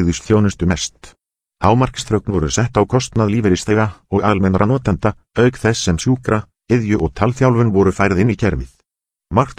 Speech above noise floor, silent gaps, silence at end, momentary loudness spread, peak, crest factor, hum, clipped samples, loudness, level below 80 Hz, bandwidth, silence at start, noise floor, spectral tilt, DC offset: 65 dB; none; 0.05 s; 6 LU; 0 dBFS; 16 dB; none; under 0.1%; -16 LUFS; -34 dBFS; 10.5 kHz; 0 s; -81 dBFS; -6 dB/octave; under 0.1%